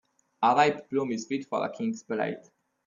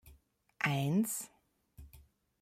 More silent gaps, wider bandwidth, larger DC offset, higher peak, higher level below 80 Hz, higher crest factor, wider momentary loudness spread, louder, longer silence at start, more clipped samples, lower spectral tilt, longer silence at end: neither; second, 7.4 kHz vs 16 kHz; neither; first, -10 dBFS vs -18 dBFS; second, -76 dBFS vs -64 dBFS; about the same, 20 dB vs 20 dB; about the same, 11 LU vs 10 LU; first, -28 LUFS vs -34 LUFS; first, 0.4 s vs 0.05 s; neither; about the same, -5 dB/octave vs -5 dB/octave; about the same, 0.45 s vs 0.4 s